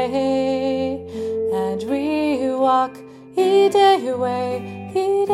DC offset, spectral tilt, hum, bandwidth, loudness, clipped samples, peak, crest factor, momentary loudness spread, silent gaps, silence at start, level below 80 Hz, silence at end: under 0.1%; -5.5 dB/octave; none; 13 kHz; -20 LUFS; under 0.1%; -4 dBFS; 14 dB; 11 LU; none; 0 s; -62 dBFS; 0 s